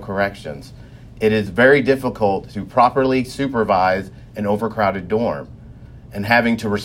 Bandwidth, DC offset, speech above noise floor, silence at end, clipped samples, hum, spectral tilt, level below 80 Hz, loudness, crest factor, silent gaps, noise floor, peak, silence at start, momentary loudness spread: 16 kHz; under 0.1%; 21 dB; 0 s; under 0.1%; none; -6.5 dB/octave; -44 dBFS; -18 LUFS; 18 dB; none; -39 dBFS; 0 dBFS; 0 s; 16 LU